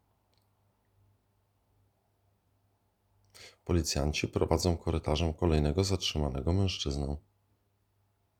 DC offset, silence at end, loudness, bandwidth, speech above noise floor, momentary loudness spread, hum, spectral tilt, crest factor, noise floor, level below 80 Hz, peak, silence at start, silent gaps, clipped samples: under 0.1%; 1.2 s; -31 LUFS; 16 kHz; 44 dB; 6 LU; none; -5.5 dB/octave; 24 dB; -74 dBFS; -44 dBFS; -10 dBFS; 3.4 s; none; under 0.1%